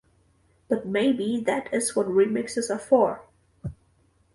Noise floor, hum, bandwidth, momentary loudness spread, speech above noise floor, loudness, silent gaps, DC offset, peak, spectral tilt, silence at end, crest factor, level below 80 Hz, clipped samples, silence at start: -64 dBFS; none; 11.5 kHz; 18 LU; 40 dB; -24 LUFS; none; under 0.1%; -6 dBFS; -4.5 dB/octave; 0.6 s; 20 dB; -58 dBFS; under 0.1%; 0.7 s